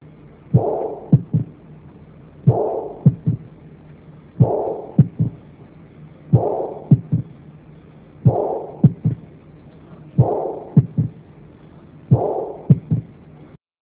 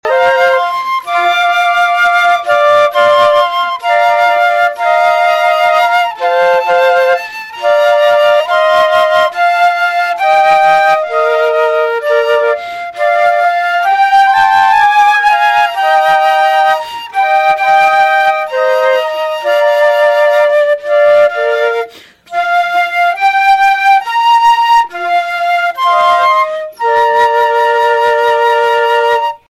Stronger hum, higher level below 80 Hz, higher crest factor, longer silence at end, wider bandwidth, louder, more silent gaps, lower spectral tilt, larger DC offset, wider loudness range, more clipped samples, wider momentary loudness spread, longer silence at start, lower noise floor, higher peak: neither; first, -44 dBFS vs -56 dBFS; first, 20 dB vs 8 dB; first, 0.35 s vs 0.2 s; second, 2.8 kHz vs 16 kHz; second, -20 LUFS vs -10 LUFS; neither; first, -14.5 dB/octave vs -1 dB/octave; neither; about the same, 3 LU vs 2 LU; neither; about the same, 7 LU vs 5 LU; first, 0.5 s vs 0.05 s; first, -45 dBFS vs -32 dBFS; about the same, 0 dBFS vs 0 dBFS